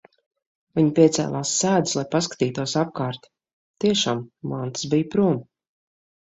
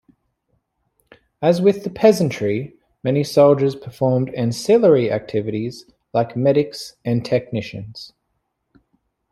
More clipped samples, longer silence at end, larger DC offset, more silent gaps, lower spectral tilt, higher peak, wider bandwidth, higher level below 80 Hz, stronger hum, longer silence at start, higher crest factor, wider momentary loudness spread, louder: neither; second, 0.9 s vs 1.25 s; neither; first, 3.53-3.74 s vs none; second, -4.5 dB/octave vs -7 dB/octave; about the same, -4 dBFS vs -2 dBFS; second, 8.2 kHz vs 14.5 kHz; about the same, -62 dBFS vs -58 dBFS; neither; second, 0.75 s vs 1.4 s; about the same, 20 dB vs 18 dB; second, 11 LU vs 16 LU; second, -22 LUFS vs -19 LUFS